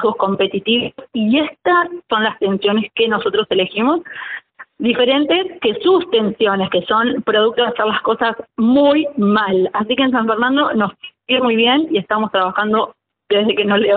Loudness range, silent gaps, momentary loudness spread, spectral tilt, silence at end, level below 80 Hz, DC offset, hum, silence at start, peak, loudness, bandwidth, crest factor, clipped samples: 2 LU; none; 6 LU; -2.5 dB/octave; 0 s; -58 dBFS; under 0.1%; none; 0 s; -4 dBFS; -16 LUFS; 4.6 kHz; 12 dB; under 0.1%